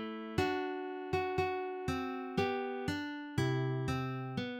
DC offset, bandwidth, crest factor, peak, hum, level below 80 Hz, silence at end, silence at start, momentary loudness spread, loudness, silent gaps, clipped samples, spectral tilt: under 0.1%; 16.5 kHz; 18 dB; -18 dBFS; none; -58 dBFS; 0 s; 0 s; 5 LU; -36 LUFS; none; under 0.1%; -6.5 dB/octave